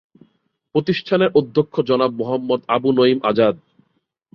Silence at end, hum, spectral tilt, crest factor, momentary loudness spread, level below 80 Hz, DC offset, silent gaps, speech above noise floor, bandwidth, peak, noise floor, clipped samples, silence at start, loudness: 0.8 s; none; -8.5 dB/octave; 16 dB; 7 LU; -60 dBFS; under 0.1%; none; 51 dB; 6 kHz; -2 dBFS; -68 dBFS; under 0.1%; 0.75 s; -18 LUFS